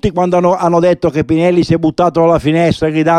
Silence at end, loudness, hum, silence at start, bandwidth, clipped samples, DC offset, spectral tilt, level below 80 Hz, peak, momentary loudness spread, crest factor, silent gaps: 0 s; -12 LUFS; none; 0.05 s; 10 kHz; under 0.1%; under 0.1%; -7.5 dB/octave; -36 dBFS; 0 dBFS; 2 LU; 10 dB; none